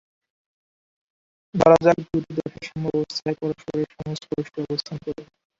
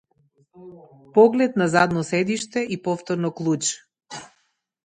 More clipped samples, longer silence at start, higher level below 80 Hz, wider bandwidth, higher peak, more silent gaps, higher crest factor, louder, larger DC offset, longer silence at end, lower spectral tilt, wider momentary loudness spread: neither; first, 1.55 s vs 0.6 s; first, -54 dBFS vs -64 dBFS; second, 7.8 kHz vs 9.6 kHz; about the same, -2 dBFS vs -4 dBFS; neither; about the same, 22 dB vs 20 dB; about the same, -23 LUFS vs -21 LUFS; neither; second, 0.35 s vs 0.6 s; first, -6.5 dB/octave vs -5 dB/octave; second, 16 LU vs 21 LU